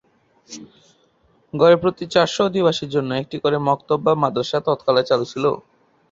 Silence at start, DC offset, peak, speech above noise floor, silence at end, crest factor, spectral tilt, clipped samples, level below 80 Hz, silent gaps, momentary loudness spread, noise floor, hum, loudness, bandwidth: 0.5 s; under 0.1%; -2 dBFS; 40 dB; 0.5 s; 18 dB; -5.5 dB/octave; under 0.1%; -58 dBFS; none; 16 LU; -59 dBFS; none; -19 LUFS; 7.8 kHz